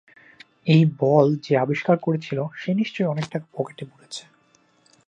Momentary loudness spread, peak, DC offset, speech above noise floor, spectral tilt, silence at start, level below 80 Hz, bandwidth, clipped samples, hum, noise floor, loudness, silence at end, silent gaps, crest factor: 18 LU; -4 dBFS; under 0.1%; 39 dB; -7.5 dB/octave; 0.65 s; -70 dBFS; 9.2 kHz; under 0.1%; none; -61 dBFS; -22 LUFS; 0.85 s; none; 20 dB